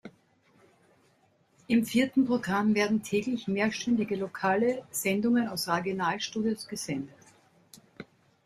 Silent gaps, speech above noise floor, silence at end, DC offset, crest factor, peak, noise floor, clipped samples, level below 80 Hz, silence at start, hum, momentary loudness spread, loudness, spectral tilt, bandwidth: none; 39 dB; 0.4 s; under 0.1%; 18 dB; -12 dBFS; -67 dBFS; under 0.1%; -68 dBFS; 0.05 s; none; 9 LU; -28 LUFS; -4.5 dB/octave; 15.5 kHz